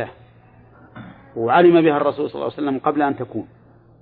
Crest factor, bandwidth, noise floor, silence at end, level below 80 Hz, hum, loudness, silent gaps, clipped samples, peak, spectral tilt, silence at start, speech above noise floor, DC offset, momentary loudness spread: 18 dB; 4.5 kHz; -49 dBFS; 0.55 s; -60 dBFS; none; -18 LUFS; none; under 0.1%; -2 dBFS; -10.5 dB/octave; 0 s; 31 dB; under 0.1%; 20 LU